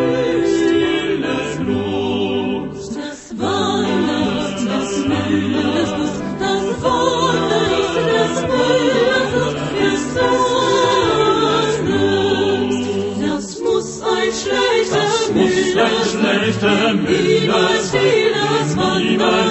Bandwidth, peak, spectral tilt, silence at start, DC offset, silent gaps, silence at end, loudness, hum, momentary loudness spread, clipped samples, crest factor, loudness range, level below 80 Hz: 8.4 kHz; -2 dBFS; -4.5 dB/octave; 0 s; under 0.1%; none; 0 s; -17 LUFS; none; 6 LU; under 0.1%; 16 dB; 4 LU; -44 dBFS